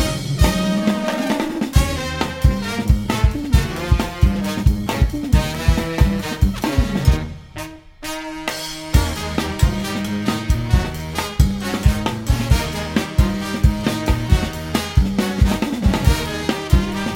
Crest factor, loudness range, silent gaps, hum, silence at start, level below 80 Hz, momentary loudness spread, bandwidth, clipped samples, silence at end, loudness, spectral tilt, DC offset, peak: 18 dB; 3 LU; none; none; 0 s; -22 dBFS; 6 LU; 17 kHz; under 0.1%; 0 s; -20 LUFS; -5.5 dB/octave; under 0.1%; 0 dBFS